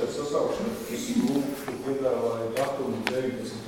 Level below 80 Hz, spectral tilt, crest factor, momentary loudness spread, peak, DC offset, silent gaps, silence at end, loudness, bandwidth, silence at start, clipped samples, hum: -60 dBFS; -5 dB/octave; 24 dB; 6 LU; -4 dBFS; under 0.1%; none; 0 s; -29 LUFS; 19 kHz; 0 s; under 0.1%; none